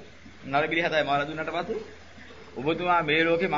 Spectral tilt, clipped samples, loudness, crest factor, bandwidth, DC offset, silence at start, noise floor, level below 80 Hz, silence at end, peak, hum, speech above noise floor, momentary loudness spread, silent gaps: -5.5 dB/octave; under 0.1%; -26 LUFS; 18 dB; 7.6 kHz; 0.3%; 0 s; -47 dBFS; -58 dBFS; 0 s; -10 dBFS; none; 22 dB; 22 LU; none